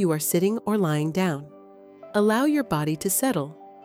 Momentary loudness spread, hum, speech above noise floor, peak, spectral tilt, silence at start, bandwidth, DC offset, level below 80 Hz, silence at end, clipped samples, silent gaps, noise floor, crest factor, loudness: 7 LU; none; 24 dB; -10 dBFS; -5 dB/octave; 0 s; 17 kHz; under 0.1%; -62 dBFS; 0.05 s; under 0.1%; none; -47 dBFS; 14 dB; -24 LUFS